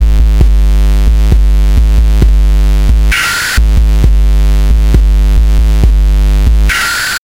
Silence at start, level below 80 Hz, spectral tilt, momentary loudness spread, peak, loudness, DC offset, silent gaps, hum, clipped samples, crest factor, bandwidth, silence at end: 0 s; -6 dBFS; -4.5 dB/octave; 1 LU; 0 dBFS; -10 LUFS; under 0.1%; none; none; 0.6%; 6 dB; 15.5 kHz; 0.05 s